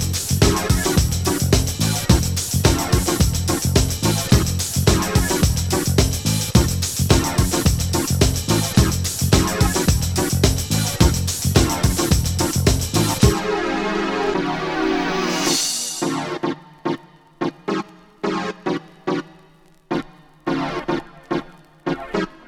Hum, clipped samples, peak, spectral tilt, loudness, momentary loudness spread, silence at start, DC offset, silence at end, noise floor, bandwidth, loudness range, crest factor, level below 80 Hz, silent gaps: none; under 0.1%; 0 dBFS; -4.5 dB/octave; -19 LUFS; 10 LU; 0 s; under 0.1%; 0.1 s; -51 dBFS; 18.5 kHz; 9 LU; 20 dB; -28 dBFS; none